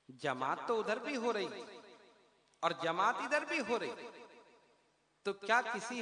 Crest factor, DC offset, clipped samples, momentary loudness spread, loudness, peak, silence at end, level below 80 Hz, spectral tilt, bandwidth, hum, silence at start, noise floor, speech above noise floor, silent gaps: 22 dB; under 0.1%; under 0.1%; 16 LU; -36 LUFS; -16 dBFS; 0 s; -86 dBFS; -3.5 dB/octave; 10.5 kHz; none; 0.1 s; -74 dBFS; 38 dB; none